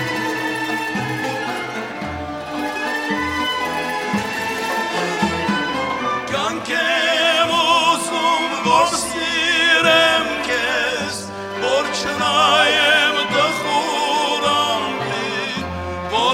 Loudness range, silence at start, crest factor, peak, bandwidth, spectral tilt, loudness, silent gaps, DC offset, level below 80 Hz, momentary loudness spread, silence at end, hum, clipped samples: 7 LU; 0 s; 18 dB; -2 dBFS; 16.5 kHz; -2.5 dB/octave; -18 LUFS; none; under 0.1%; -48 dBFS; 11 LU; 0 s; none; under 0.1%